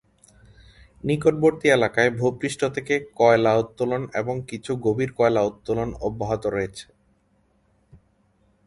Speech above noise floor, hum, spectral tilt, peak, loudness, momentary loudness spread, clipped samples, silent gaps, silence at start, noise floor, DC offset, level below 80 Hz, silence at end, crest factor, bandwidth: 42 dB; none; -6 dB/octave; -2 dBFS; -23 LUFS; 10 LU; under 0.1%; none; 1.05 s; -64 dBFS; under 0.1%; -52 dBFS; 1.85 s; 20 dB; 11.5 kHz